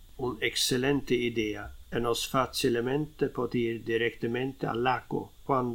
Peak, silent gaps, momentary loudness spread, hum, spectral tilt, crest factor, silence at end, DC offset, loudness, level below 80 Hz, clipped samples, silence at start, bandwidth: -12 dBFS; none; 7 LU; none; -4.5 dB/octave; 18 dB; 0 s; under 0.1%; -30 LUFS; -50 dBFS; under 0.1%; 0 s; 18 kHz